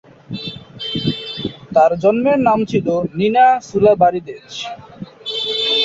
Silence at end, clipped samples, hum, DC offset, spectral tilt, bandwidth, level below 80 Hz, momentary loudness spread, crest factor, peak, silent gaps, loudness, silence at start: 0 s; under 0.1%; none; under 0.1%; -5.5 dB/octave; 8 kHz; -50 dBFS; 17 LU; 16 dB; -2 dBFS; none; -16 LUFS; 0.3 s